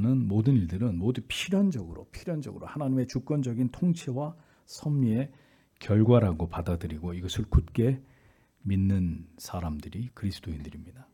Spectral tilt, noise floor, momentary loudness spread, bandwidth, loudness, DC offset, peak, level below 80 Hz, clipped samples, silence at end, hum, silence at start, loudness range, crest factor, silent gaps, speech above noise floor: -7.5 dB/octave; -62 dBFS; 14 LU; 15 kHz; -29 LUFS; under 0.1%; -8 dBFS; -42 dBFS; under 0.1%; 0.1 s; none; 0 s; 4 LU; 20 dB; none; 34 dB